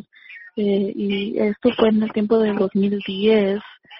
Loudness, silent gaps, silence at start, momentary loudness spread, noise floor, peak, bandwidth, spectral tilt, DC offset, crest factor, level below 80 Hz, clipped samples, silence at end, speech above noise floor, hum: -20 LUFS; none; 0.3 s; 9 LU; -43 dBFS; -4 dBFS; 5.6 kHz; -5.5 dB/octave; under 0.1%; 16 dB; -56 dBFS; under 0.1%; 0 s; 24 dB; none